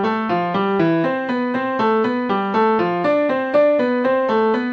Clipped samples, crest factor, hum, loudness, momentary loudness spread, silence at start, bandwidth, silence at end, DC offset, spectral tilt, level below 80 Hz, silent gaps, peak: under 0.1%; 12 dB; none; -18 LUFS; 4 LU; 0 s; 7.2 kHz; 0 s; under 0.1%; -8 dB/octave; -64 dBFS; none; -6 dBFS